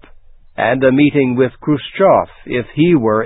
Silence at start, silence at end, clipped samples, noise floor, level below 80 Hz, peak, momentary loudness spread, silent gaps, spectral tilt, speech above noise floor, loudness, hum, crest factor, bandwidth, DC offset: 0.6 s; 0 s; under 0.1%; -40 dBFS; -46 dBFS; 0 dBFS; 9 LU; none; -12 dB/octave; 27 dB; -14 LUFS; none; 14 dB; 4 kHz; under 0.1%